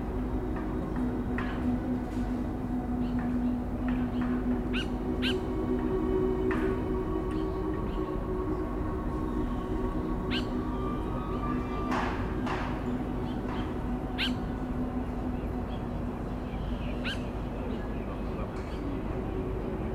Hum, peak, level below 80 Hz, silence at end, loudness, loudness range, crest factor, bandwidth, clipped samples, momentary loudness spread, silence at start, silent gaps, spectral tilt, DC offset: none; -16 dBFS; -38 dBFS; 0 s; -32 LUFS; 4 LU; 14 dB; 13 kHz; under 0.1%; 5 LU; 0 s; none; -7.5 dB/octave; under 0.1%